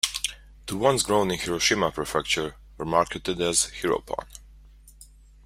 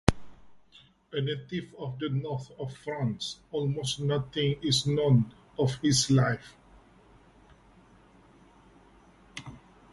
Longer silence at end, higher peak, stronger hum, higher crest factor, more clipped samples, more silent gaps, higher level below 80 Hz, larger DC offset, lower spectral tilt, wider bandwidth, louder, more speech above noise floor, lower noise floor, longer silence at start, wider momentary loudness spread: about the same, 0.4 s vs 0.35 s; about the same, -2 dBFS vs -2 dBFS; neither; second, 24 dB vs 30 dB; neither; neither; about the same, -48 dBFS vs -50 dBFS; neither; second, -2.5 dB/octave vs -5 dB/octave; first, 16 kHz vs 11.5 kHz; first, -25 LUFS vs -29 LUFS; second, 25 dB vs 31 dB; second, -50 dBFS vs -59 dBFS; about the same, 0.05 s vs 0.05 s; about the same, 13 LU vs 15 LU